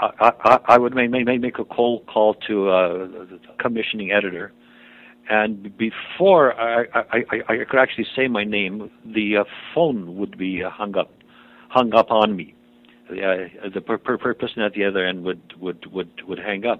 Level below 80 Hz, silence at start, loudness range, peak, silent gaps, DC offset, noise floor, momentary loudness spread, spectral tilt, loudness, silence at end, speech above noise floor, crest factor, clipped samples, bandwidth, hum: -60 dBFS; 0 s; 5 LU; 0 dBFS; none; under 0.1%; -51 dBFS; 15 LU; -6.5 dB/octave; -20 LUFS; 0 s; 31 dB; 20 dB; under 0.1%; 7.8 kHz; none